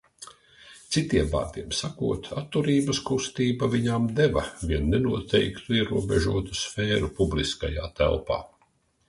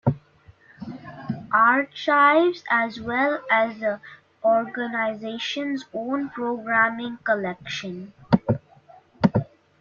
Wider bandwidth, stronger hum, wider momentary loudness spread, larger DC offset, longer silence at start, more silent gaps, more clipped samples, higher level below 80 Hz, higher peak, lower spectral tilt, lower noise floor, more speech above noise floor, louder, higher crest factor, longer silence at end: first, 11.5 kHz vs 7.2 kHz; neither; second, 7 LU vs 17 LU; neither; first, 0.2 s vs 0.05 s; neither; neither; first, -38 dBFS vs -58 dBFS; second, -10 dBFS vs -2 dBFS; about the same, -5.5 dB/octave vs -6.5 dB/octave; first, -67 dBFS vs -54 dBFS; first, 41 dB vs 31 dB; second, -26 LUFS vs -23 LUFS; about the same, 18 dB vs 22 dB; first, 0.6 s vs 0.35 s